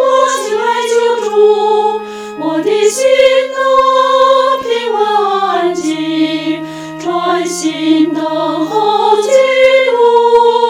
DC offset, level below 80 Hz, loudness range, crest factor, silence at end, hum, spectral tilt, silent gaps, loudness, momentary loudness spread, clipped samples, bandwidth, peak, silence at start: under 0.1%; -56 dBFS; 4 LU; 10 dB; 0 s; none; -3 dB/octave; none; -11 LUFS; 8 LU; 0.3%; 15.5 kHz; 0 dBFS; 0 s